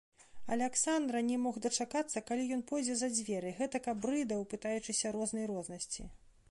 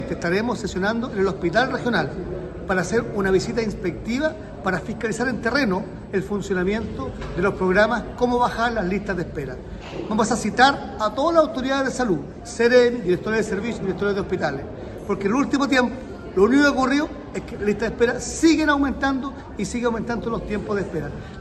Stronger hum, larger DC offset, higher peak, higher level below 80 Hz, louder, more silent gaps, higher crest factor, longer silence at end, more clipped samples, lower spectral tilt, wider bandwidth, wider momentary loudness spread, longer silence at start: neither; neither; second, -20 dBFS vs -2 dBFS; second, -64 dBFS vs -40 dBFS; second, -36 LUFS vs -22 LUFS; neither; about the same, 18 dB vs 20 dB; first, 0.2 s vs 0 s; neither; second, -3 dB/octave vs -5 dB/octave; about the same, 11.5 kHz vs 12.5 kHz; second, 8 LU vs 12 LU; first, 0.2 s vs 0 s